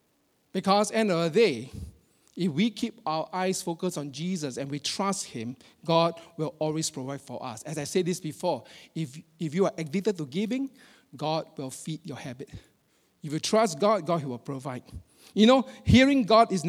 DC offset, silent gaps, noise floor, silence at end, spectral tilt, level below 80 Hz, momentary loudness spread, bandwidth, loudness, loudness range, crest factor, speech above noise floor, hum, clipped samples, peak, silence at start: under 0.1%; none; -70 dBFS; 0 s; -5 dB/octave; -52 dBFS; 18 LU; 15 kHz; -27 LUFS; 6 LU; 20 dB; 43 dB; none; under 0.1%; -6 dBFS; 0.55 s